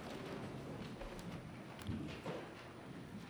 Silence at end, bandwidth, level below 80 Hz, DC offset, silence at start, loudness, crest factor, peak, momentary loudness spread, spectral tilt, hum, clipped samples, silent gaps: 0 s; over 20 kHz; -62 dBFS; under 0.1%; 0 s; -49 LUFS; 18 dB; -30 dBFS; 6 LU; -6 dB/octave; none; under 0.1%; none